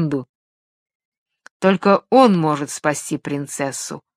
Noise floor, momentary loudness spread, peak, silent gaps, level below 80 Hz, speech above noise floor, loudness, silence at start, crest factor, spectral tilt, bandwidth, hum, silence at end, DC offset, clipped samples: under -90 dBFS; 12 LU; 0 dBFS; 0.29-0.86 s, 0.95-1.12 s, 1.18-1.26 s, 1.51-1.60 s; -66 dBFS; over 72 dB; -18 LUFS; 0 s; 20 dB; -5.5 dB/octave; 15 kHz; none; 0.2 s; under 0.1%; under 0.1%